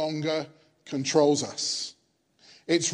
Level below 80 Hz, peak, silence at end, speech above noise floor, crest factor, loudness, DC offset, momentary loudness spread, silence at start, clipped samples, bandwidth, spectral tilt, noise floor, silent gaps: -78 dBFS; -8 dBFS; 0 s; 38 dB; 20 dB; -27 LUFS; under 0.1%; 15 LU; 0 s; under 0.1%; 11 kHz; -3.5 dB/octave; -64 dBFS; none